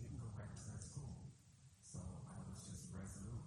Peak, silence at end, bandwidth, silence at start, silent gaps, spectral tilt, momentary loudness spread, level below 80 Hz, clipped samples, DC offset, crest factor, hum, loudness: -34 dBFS; 0 s; 13.5 kHz; 0 s; none; -5.5 dB/octave; 9 LU; -64 dBFS; under 0.1%; under 0.1%; 18 dB; none; -53 LUFS